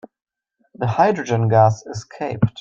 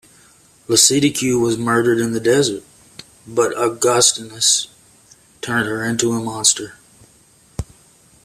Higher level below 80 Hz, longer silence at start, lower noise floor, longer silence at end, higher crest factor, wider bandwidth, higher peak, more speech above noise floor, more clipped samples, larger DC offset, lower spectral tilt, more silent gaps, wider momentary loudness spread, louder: about the same, -50 dBFS vs -48 dBFS; about the same, 0.8 s vs 0.7 s; first, -63 dBFS vs -52 dBFS; second, 0 s vs 0.6 s; about the same, 18 dB vs 20 dB; second, 7.4 kHz vs 15 kHz; about the same, -2 dBFS vs 0 dBFS; first, 45 dB vs 35 dB; neither; neither; first, -7 dB/octave vs -2.5 dB/octave; neither; second, 13 LU vs 20 LU; second, -19 LUFS vs -16 LUFS